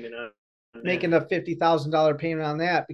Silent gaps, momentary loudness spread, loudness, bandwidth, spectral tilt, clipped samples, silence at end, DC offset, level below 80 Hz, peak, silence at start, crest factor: 0.38-0.73 s; 14 LU; -24 LUFS; 9.2 kHz; -7 dB/octave; under 0.1%; 0 s; under 0.1%; -66 dBFS; -8 dBFS; 0 s; 16 dB